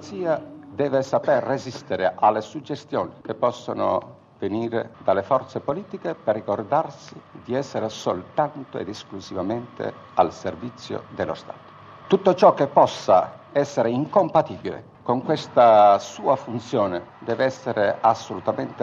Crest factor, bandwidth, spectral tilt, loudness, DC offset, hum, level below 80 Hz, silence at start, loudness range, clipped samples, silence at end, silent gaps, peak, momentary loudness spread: 20 dB; 7.6 kHz; -6 dB/octave; -23 LUFS; under 0.1%; none; -68 dBFS; 0 s; 8 LU; under 0.1%; 0 s; none; -2 dBFS; 15 LU